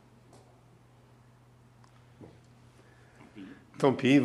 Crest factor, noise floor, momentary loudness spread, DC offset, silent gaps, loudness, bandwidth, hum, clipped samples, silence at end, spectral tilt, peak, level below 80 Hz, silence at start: 24 dB; -59 dBFS; 28 LU; under 0.1%; none; -27 LUFS; 11.5 kHz; none; under 0.1%; 0 s; -6.5 dB/octave; -10 dBFS; -70 dBFS; 2.2 s